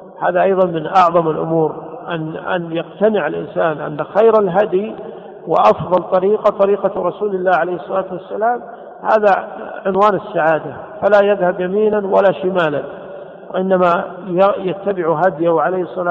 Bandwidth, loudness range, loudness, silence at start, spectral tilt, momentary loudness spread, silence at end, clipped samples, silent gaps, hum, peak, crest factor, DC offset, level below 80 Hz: 7.4 kHz; 2 LU; -16 LUFS; 0 s; -8 dB/octave; 12 LU; 0 s; under 0.1%; none; none; -2 dBFS; 14 dB; under 0.1%; -56 dBFS